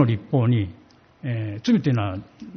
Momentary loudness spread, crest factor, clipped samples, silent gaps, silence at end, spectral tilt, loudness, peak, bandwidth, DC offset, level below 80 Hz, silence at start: 12 LU; 18 dB; under 0.1%; none; 0 s; -7.5 dB/octave; -23 LUFS; -6 dBFS; 6.4 kHz; under 0.1%; -56 dBFS; 0 s